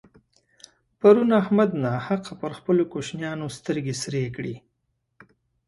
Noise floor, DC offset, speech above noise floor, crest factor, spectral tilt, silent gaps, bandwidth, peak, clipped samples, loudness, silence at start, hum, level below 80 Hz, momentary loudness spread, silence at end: -75 dBFS; under 0.1%; 52 dB; 22 dB; -6.5 dB/octave; none; 11.5 kHz; -4 dBFS; under 0.1%; -23 LUFS; 1.05 s; none; -62 dBFS; 15 LU; 1.1 s